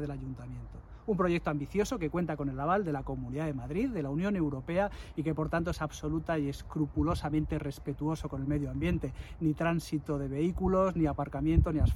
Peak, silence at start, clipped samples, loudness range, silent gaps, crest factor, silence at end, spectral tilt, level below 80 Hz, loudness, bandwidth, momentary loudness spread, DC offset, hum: -12 dBFS; 0 s; under 0.1%; 2 LU; none; 20 dB; 0 s; -7.5 dB/octave; -42 dBFS; -33 LUFS; 16 kHz; 8 LU; under 0.1%; none